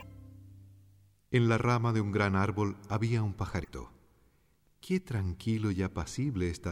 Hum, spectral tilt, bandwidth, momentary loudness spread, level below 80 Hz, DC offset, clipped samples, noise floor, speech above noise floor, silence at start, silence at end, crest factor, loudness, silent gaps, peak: none; -7 dB/octave; 12.5 kHz; 12 LU; -52 dBFS; under 0.1%; under 0.1%; -69 dBFS; 39 dB; 0 s; 0 s; 18 dB; -31 LUFS; none; -14 dBFS